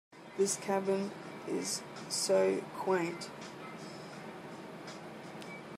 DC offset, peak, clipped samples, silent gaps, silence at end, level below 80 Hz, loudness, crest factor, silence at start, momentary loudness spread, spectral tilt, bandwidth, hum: under 0.1%; -18 dBFS; under 0.1%; none; 0 s; -80 dBFS; -35 LUFS; 18 dB; 0.1 s; 16 LU; -3.5 dB/octave; 15 kHz; none